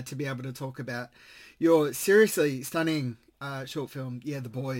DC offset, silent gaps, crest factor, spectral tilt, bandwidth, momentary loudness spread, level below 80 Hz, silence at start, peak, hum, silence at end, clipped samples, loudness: under 0.1%; none; 18 dB; -5 dB/octave; 17 kHz; 16 LU; -70 dBFS; 0 s; -10 dBFS; none; 0 s; under 0.1%; -28 LUFS